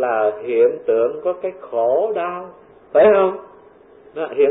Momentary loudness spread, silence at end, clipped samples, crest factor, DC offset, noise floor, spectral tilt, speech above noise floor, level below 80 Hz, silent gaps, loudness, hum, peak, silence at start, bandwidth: 17 LU; 0 s; under 0.1%; 14 dB; under 0.1%; -46 dBFS; -10.5 dB/octave; 29 dB; -60 dBFS; none; -18 LUFS; none; -4 dBFS; 0 s; 4 kHz